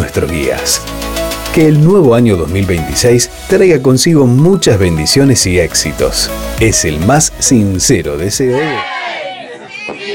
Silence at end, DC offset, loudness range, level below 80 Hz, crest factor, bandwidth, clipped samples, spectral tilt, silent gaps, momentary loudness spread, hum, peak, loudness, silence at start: 0 s; under 0.1%; 3 LU; -28 dBFS; 10 dB; 17.5 kHz; under 0.1%; -4.5 dB/octave; none; 11 LU; none; 0 dBFS; -10 LUFS; 0 s